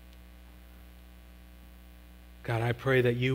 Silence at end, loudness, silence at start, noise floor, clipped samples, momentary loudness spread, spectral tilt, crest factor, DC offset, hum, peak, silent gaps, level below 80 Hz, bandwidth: 0 s; -29 LUFS; 0.05 s; -51 dBFS; under 0.1%; 27 LU; -7 dB/octave; 20 dB; under 0.1%; 60 Hz at -50 dBFS; -12 dBFS; none; -52 dBFS; 16 kHz